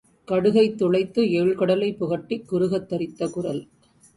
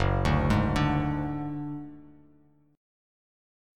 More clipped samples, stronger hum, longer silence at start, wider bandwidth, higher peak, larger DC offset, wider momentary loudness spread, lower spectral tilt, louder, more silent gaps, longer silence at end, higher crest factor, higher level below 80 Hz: neither; neither; first, 0.3 s vs 0 s; about the same, 11.5 kHz vs 12 kHz; first, -8 dBFS vs -12 dBFS; neither; second, 9 LU vs 14 LU; about the same, -7 dB/octave vs -7.5 dB/octave; first, -23 LUFS vs -28 LUFS; neither; second, 0.5 s vs 1.65 s; about the same, 16 dB vs 18 dB; second, -60 dBFS vs -38 dBFS